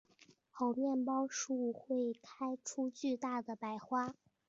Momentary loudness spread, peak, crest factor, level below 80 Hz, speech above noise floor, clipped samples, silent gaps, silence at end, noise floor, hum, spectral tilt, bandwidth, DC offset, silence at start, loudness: 8 LU; -24 dBFS; 14 dB; -84 dBFS; 29 dB; under 0.1%; none; 0.35 s; -68 dBFS; none; -4 dB/octave; 7.6 kHz; under 0.1%; 0.55 s; -39 LUFS